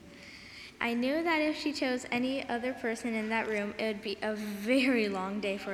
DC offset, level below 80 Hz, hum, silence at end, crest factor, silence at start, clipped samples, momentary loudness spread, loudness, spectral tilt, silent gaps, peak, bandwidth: under 0.1%; -66 dBFS; none; 0 s; 18 dB; 0 s; under 0.1%; 8 LU; -32 LUFS; -4.5 dB/octave; none; -14 dBFS; 15.5 kHz